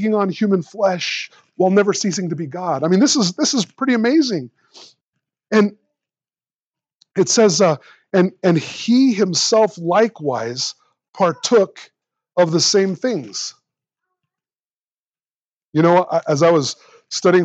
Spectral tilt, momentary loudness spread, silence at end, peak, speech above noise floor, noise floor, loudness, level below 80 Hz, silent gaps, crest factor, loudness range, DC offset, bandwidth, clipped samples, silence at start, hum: -4.5 dB/octave; 11 LU; 0 s; -2 dBFS; over 73 dB; under -90 dBFS; -17 LUFS; -78 dBFS; 5.01-5.13 s, 6.55-6.72 s, 6.94-7.00 s, 11.09-11.13 s, 14.65-15.13 s, 15.35-15.72 s; 18 dB; 5 LU; under 0.1%; 9 kHz; under 0.1%; 0 s; none